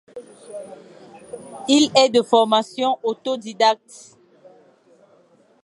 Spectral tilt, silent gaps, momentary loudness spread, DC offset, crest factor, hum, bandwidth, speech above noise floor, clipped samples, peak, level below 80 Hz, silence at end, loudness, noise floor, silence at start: -3 dB/octave; none; 24 LU; under 0.1%; 20 dB; none; 11.5 kHz; 36 dB; under 0.1%; -2 dBFS; -74 dBFS; 1.9 s; -18 LUFS; -56 dBFS; 0.15 s